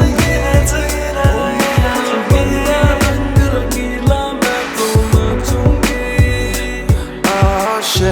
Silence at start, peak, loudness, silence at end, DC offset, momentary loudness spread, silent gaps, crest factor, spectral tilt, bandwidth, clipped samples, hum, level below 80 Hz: 0 s; 0 dBFS; -14 LUFS; 0 s; under 0.1%; 4 LU; none; 14 dB; -5 dB/octave; over 20 kHz; under 0.1%; none; -20 dBFS